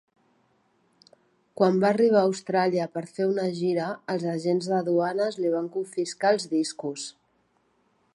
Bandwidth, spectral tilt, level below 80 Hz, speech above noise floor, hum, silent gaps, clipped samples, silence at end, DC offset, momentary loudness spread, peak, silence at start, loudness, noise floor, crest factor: 11.5 kHz; -5.5 dB/octave; -76 dBFS; 44 dB; none; none; under 0.1%; 1.05 s; under 0.1%; 10 LU; -6 dBFS; 1.6 s; -25 LUFS; -68 dBFS; 20 dB